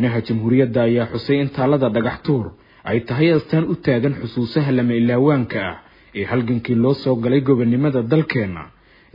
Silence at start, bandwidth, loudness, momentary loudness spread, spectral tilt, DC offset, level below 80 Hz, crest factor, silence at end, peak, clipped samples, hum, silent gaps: 0 s; 5.4 kHz; -19 LUFS; 8 LU; -10.5 dB/octave; under 0.1%; -52 dBFS; 16 dB; 0.45 s; -2 dBFS; under 0.1%; none; none